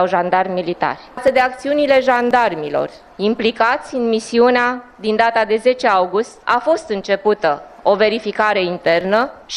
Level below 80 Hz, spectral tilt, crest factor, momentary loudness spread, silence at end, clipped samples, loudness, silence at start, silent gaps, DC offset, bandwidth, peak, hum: -54 dBFS; -4.5 dB/octave; 16 dB; 7 LU; 0 s; under 0.1%; -16 LUFS; 0 s; none; under 0.1%; 11 kHz; 0 dBFS; none